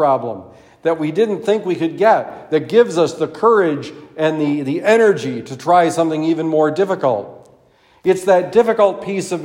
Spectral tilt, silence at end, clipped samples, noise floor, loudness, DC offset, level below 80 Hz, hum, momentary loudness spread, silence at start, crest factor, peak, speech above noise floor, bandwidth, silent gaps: -6 dB/octave; 0 s; under 0.1%; -52 dBFS; -16 LUFS; under 0.1%; -64 dBFS; none; 10 LU; 0 s; 16 dB; 0 dBFS; 36 dB; 15.5 kHz; none